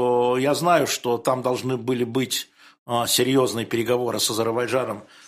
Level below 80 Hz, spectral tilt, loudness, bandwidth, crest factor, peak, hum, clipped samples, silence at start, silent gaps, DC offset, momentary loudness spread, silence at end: -64 dBFS; -4 dB/octave; -22 LUFS; 15.5 kHz; 18 dB; -4 dBFS; none; under 0.1%; 0 s; 2.78-2.86 s; under 0.1%; 6 LU; 0.25 s